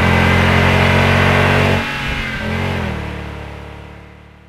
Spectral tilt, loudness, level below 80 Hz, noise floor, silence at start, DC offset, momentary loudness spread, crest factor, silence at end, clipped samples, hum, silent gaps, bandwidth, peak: -6 dB/octave; -14 LUFS; -30 dBFS; -39 dBFS; 0 s; under 0.1%; 18 LU; 14 dB; 0.4 s; under 0.1%; none; none; 15 kHz; 0 dBFS